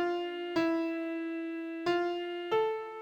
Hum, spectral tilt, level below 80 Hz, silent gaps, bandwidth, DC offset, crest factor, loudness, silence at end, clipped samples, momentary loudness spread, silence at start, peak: none; -5.5 dB/octave; -74 dBFS; none; 8 kHz; under 0.1%; 14 dB; -33 LUFS; 0 s; under 0.1%; 6 LU; 0 s; -18 dBFS